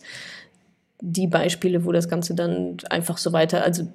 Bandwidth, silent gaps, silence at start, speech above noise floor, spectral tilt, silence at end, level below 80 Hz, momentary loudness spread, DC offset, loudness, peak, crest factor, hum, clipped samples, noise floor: 15.5 kHz; none; 0.05 s; 40 dB; -5 dB/octave; 0 s; -68 dBFS; 16 LU; under 0.1%; -23 LUFS; -4 dBFS; 20 dB; none; under 0.1%; -63 dBFS